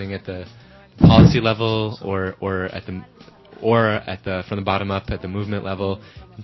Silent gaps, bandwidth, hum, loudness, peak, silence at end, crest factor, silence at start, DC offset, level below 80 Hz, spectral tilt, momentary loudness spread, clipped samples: none; 6 kHz; none; -19 LUFS; 0 dBFS; 0 s; 18 dB; 0 s; under 0.1%; -36 dBFS; -8 dB/octave; 19 LU; under 0.1%